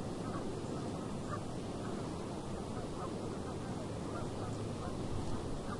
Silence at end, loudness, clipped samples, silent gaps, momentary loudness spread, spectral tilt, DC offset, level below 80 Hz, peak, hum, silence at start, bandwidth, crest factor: 0 s; -41 LUFS; under 0.1%; none; 1 LU; -6.5 dB/octave; under 0.1%; -52 dBFS; -26 dBFS; none; 0 s; 11.5 kHz; 14 dB